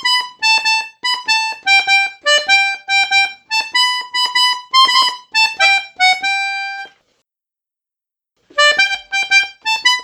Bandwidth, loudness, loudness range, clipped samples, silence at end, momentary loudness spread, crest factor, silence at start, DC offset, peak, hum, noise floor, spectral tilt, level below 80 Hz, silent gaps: 19 kHz; -13 LUFS; 4 LU; under 0.1%; 0 s; 7 LU; 16 dB; 0 s; under 0.1%; 0 dBFS; none; -87 dBFS; 3 dB/octave; -66 dBFS; none